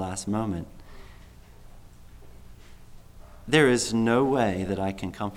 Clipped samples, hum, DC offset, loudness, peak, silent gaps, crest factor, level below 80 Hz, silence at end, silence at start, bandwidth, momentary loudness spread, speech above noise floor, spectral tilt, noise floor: under 0.1%; none; under 0.1%; -25 LUFS; -8 dBFS; none; 20 dB; -48 dBFS; 0 s; 0 s; 16 kHz; 14 LU; 24 dB; -5 dB/octave; -48 dBFS